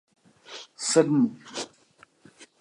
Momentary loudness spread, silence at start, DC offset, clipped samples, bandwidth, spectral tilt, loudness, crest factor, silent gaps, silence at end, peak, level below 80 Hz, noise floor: 21 LU; 0.5 s; under 0.1%; under 0.1%; 11.5 kHz; -4.5 dB/octave; -25 LUFS; 22 dB; none; 0.15 s; -6 dBFS; -80 dBFS; -59 dBFS